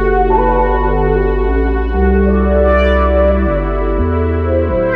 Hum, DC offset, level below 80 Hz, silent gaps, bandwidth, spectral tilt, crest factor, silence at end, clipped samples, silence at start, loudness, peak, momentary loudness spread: none; under 0.1%; -16 dBFS; none; 4.7 kHz; -10 dB/octave; 12 dB; 0 s; under 0.1%; 0 s; -13 LUFS; 0 dBFS; 4 LU